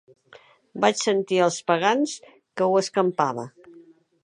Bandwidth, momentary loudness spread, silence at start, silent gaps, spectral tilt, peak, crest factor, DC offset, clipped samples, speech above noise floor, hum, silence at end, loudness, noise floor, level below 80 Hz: 11 kHz; 17 LU; 0.75 s; none; -4 dB/octave; -4 dBFS; 20 dB; under 0.1%; under 0.1%; 30 dB; none; 0.45 s; -23 LUFS; -53 dBFS; -76 dBFS